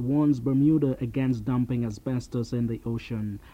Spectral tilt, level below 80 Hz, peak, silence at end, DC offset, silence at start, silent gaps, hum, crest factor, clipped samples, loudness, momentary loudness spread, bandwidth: -9 dB/octave; -50 dBFS; -12 dBFS; 0.05 s; under 0.1%; 0 s; none; none; 14 dB; under 0.1%; -27 LUFS; 9 LU; 9.4 kHz